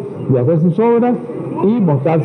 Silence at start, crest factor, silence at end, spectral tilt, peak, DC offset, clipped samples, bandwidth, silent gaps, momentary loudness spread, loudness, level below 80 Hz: 0 s; 10 dB; 0 s; -11 dB/octave; -4 dBFS; under 0.1%; under 0.1%; 4.2 kHz; none; 6 LU; -14 LUFS; -56 dBFS